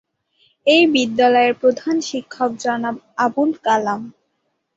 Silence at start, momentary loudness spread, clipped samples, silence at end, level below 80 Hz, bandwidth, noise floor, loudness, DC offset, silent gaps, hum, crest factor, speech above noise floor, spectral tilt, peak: 0.65 s; 11 LU; under 0.1%; 0.65 s; -64 dBFS; 8 kHz; -71 dBFS; -18 LUFS; under 0.1%; none; none; 16 dB; 54 dB; -3.5 dB/octave; -2 dBFS